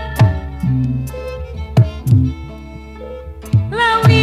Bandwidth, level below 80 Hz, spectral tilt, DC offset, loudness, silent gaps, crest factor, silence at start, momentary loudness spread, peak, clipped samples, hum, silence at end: 14 kHz; -30 dBFS; -7 dB/octave; under 0.1%; -16 LUFS; none; 16 dB; 0 s; 18 LU; 0 dBFS; under 0.1%; none; 0 s